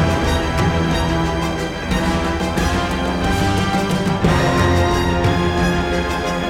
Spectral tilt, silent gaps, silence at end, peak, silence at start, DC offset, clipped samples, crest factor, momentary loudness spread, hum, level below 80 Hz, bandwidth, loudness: -5.5 dB/octave; none; 0 s; -2 dBFS; 0 s; under 0.1%; under 0.1%; 14 dB; 4 LU; none; -28 dBFS; 17 kHz; -18 LUFS